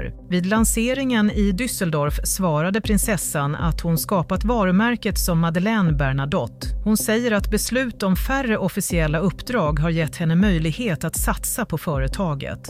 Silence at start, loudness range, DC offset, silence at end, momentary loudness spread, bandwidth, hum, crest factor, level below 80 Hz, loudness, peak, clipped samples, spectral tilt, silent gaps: 0 s; 1 LU; under 0.1%; 0 s; 5 LU; 16 kHz; none; 14 dB; -30 dBFS; -21 LUFS; -8 dBFS; under 0.1%; -5 dB/octave; none